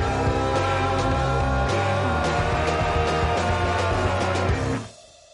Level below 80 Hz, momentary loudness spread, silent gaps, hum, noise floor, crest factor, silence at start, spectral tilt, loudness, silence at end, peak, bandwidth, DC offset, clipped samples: -32 dBFS; 1 LU; none; none; -44 dBFS; 10 dB; 0 s; -5.5 dB/octave; -23 LUFS; 0.35 s; -12 dBFS; 11.5 kHz; under 0.1%; under 0.1%